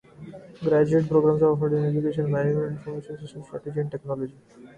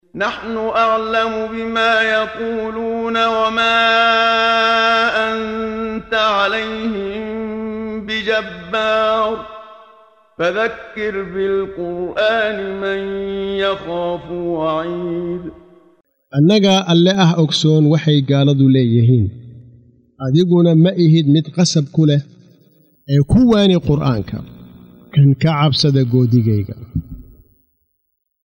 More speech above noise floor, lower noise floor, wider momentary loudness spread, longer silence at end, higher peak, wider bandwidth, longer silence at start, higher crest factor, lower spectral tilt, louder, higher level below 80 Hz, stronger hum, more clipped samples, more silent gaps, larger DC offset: second, 19 dB vs 56 dB; second, -43 dBFS vs -71 dBFS; first, 18 LU vs 11 LU; second, 0.1 s vs 1.25 s; second, -8 dBFS vs -2 dBFS; about the same, 9 kHz vs 9.2 kHz; about the same, 0.2 s vs 0.15 s; about the same, 16 dB vs 14 dB; first, -9.5 dB/octave vs -6 dB/octave; second, -24 LUFS vs -16 LUFS; second, -58 dBFS vs -42 dBFS; neither; neither; neither; neither